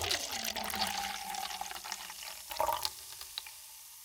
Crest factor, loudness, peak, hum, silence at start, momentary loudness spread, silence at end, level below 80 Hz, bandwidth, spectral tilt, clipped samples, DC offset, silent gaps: 26 dB; -37 LUFS; -12 dBFS; none; 0 s; 10 LU; 0 s; -64 dBFS; 19 kHz; -0.5 dB/octave; under 0.1%; under 0.1%; none